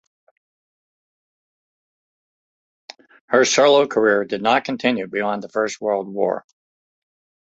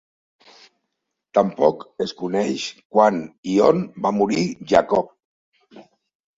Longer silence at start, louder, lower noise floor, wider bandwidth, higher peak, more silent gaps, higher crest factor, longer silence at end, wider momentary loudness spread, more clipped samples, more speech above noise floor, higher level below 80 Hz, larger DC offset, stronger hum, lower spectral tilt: first, 3.3 s vs 1.35 s; about the same, -19 LUFS vs -20 LUFS; first, under -90 dBFS vs -79 dBFS; about the same, 8 kHz vs 7.8 kHz; about the same, -2 dBFS vs -2 dBFS; second, none vs 2.85-2.90 s, 3.38-3.43 s, 5.25-5.52 s; about the same, 20 dB vs 20 dB; first, 1.15 s vs 0.6 s; about the same, 9 LU vs 11 LU; neither; first, over 72 dB vs 59 dB; second, -68 dBFS vs -58 dBFS; neither; neither; second, -3 dB/octave vs -6 dB/octave